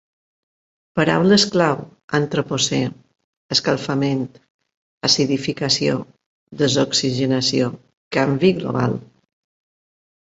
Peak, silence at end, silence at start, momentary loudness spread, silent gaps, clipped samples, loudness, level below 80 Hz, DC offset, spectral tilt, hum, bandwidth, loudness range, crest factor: 0 dBFS; 1.2 s; 0.95 s; 10 LU; 2.04-2.08 s, 3.24-3.49 s, 4.50-4.59 s, 4.77-5.01 s, 6.26-6.47 s, 7.97-8.11 s; under 0.1%; -19 LUFS; -56 dBFS; under 0.1%; -4.5 dB/octave; none; 8.2 kHz; 2 LU; 20 dB